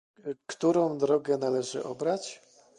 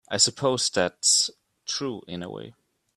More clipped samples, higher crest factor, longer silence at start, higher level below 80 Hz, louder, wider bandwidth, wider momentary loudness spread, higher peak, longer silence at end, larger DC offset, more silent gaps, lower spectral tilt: neither; about the same, 16 dB vs 20 dB; first, 0.25 s vs 0.1 s; second, -76 dBFS vs -68 dBFS; second, -29 LUFS vs -23 LUFS; second, 11 kHz vs 15 kHz; second, 14 LU vs 18 LU; second, -14 dBFS vs -6 dBFS; about the same, 0.4 s vs 0.45 s; neither; neither; first, -5.5 dB/octave vs -1.5 dB/octave